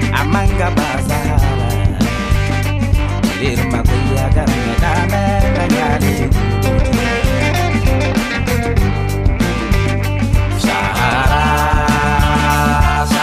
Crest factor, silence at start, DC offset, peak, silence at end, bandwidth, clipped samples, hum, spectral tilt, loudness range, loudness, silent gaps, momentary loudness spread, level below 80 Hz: 12 dB; 0 s; under 0.1%; -2 dBFS; 0 s; 15.5 kHz; under 0.1%; none; -6 dB/octave; 2 LU; -15 LUFS; none; 3 LU; -20 dBFS